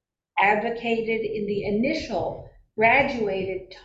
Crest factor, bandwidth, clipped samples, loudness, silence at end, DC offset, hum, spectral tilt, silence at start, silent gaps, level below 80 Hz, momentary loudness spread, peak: 18 dB; 7.8 kHz; under 0.1%; -24 LUFS; 0.05 s; under 0.1%; none; -6 dB/octave; 0.35 s; none; -50 dBFS; 13 LU; -6 dBFS